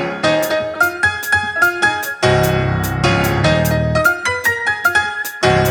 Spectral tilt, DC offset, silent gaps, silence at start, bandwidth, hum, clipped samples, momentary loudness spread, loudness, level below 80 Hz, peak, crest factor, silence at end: -4.5 dB/octave; under 0.1%; none; 0 s; 18 kHz; none; under 0.1%; 3 LU; -15 LUFS; -34 dBFS; -2 dBFS; 14 dB; 0 s